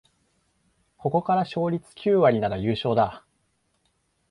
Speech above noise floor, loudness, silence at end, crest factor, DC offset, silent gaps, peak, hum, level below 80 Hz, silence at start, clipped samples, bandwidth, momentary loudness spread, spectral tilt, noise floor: 48 dB; -24 LUFS; 1.1 s; 18 dB; under 0.1%; none; -8 dBFS; none; -56 dBFS; 1.05 s; under 0.1%; 11 kHz; 8 LU; -8 dB/octave; -71 dBFS